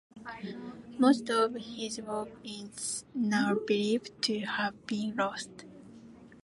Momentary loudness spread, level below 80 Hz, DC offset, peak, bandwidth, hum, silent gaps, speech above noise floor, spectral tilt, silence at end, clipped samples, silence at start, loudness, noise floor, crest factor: 17 LU; -70 dBFS; under 0.1%; -12 dBFS; 11.5 kHz; none; none; 21 dB; -4 dB/octave; 0.05 s; under 0.1%; 0.15 s; -31 LUFS; -52 dBFS; 20 dB